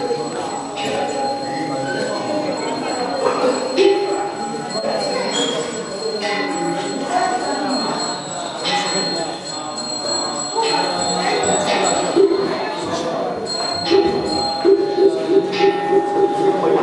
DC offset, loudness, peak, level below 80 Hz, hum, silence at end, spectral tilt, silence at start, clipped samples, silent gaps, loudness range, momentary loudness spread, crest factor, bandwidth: under 0.1%; -19 LUFS; -2 dBFS; -58 dBFS; none; 0 s; -3 dB/octave; 0 s; under 0.1%; none; 4 LU; 8 LU; 18 dB; 11.5 kHz